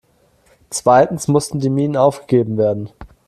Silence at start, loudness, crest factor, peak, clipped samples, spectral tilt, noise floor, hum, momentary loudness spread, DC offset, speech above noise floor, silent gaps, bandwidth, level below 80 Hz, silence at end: 0.7 s; -16 LUFS; 16 dB; 0 dBFS; under 0.1%; -6 dB/octave; -56 dBFS; none; 11 LU; under 0.1%; 40 dB; none; 14.5 kHz; -50 dBFS; 0.2 s